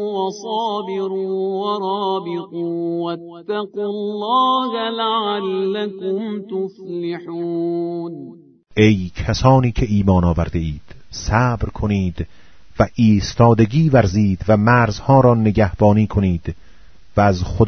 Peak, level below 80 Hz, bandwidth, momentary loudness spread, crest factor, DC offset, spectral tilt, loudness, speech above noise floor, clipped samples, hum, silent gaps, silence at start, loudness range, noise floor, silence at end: 0 dBFS; -34 dBFS; 6.6 kHz; 12 LU; 18 dB; under 0.1%; -7 dB/octave; -18 LUFS; 31 dB; under 0.1%; none; none; 0 s; 8 LU; -48 dBFS; 0 s